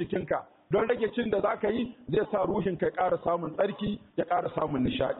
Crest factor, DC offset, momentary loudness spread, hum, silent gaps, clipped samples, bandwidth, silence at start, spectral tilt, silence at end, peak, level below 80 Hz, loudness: 14 dB; under 0.1%; 6 LU; none; none; under 0.1%; 4.1 kHz; 0 s; -5 dB/octave; 0 s; -16 dBFS; -56 dBFS; -29 LUFS